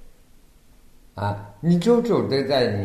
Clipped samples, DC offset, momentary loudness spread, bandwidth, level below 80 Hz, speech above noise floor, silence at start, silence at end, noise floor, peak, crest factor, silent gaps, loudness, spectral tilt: under 0.1%; under 0.1%; 11 LU; 13.5 kHz; -52 dBFS; 31 dB; 0 s; 0 s; -51 dBFS; -6 dBFS; 18 dB; none; -22 LUFS; -7 dB/octave